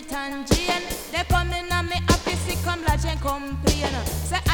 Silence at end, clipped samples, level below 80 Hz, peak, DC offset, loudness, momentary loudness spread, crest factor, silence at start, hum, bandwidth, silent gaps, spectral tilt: 0 s; under 0.1%; -30 dBFS; -4 dBFS; under 0.1%; -24 LUFS; 5 LU; 20 dB; 0 s; none; 19 kHz; none; -4 dB/octave